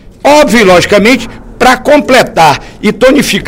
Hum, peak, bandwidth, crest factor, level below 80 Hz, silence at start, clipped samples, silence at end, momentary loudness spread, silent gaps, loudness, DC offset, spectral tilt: none; 0 dBFS; 18 kHz; 6 dB; -30 dBFS; 0.25 s; 5%; 0 s; 7 LU; none; -6 LUFS; under 0.1%; -4 dB/octave